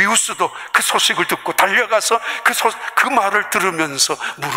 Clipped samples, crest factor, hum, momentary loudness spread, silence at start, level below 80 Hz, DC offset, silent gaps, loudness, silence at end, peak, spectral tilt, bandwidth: under 0.1%; 16 dB; none; 4 LU; 0 s; -64 dBFS; under 0.1%; none; -16 LUFS; 0 s; -2 dBFS; -1 dB/octave; 16.5 kHz